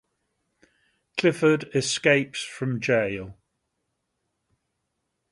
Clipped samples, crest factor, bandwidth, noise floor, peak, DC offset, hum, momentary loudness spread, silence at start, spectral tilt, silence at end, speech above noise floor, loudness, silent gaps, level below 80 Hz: under 0.1%; 24 dB; 11.5 kHz; -78 dBFS; -4 dBFS; under 0.1%; none; 12 LU; 1.15 s; -4.5 dB/octave; 2 s; 55 dB; -24 LUFS; none; -62 dBFS